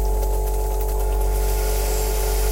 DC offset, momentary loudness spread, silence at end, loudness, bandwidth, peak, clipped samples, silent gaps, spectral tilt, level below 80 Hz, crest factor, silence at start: under 0.1%; 2 LU; 0 s; -23 LUFS; 17 kHz; -10 dBFS; under 0.1%; none; -4.5 dB/octave; -20 dBFS; 10 dB; 0 s